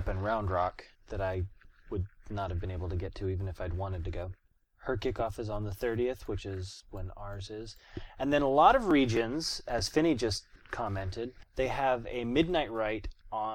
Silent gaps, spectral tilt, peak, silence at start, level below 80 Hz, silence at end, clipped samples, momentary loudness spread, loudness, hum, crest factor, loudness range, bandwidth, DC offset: none; -5.5 dB/octave; -10 dBFS; 0 s; -46 dBFS; 0 s; under 0.1%; 16 LU; -32 LUFS; none; 22 dB; 9 LU; 16.5 kHz; under 0.1%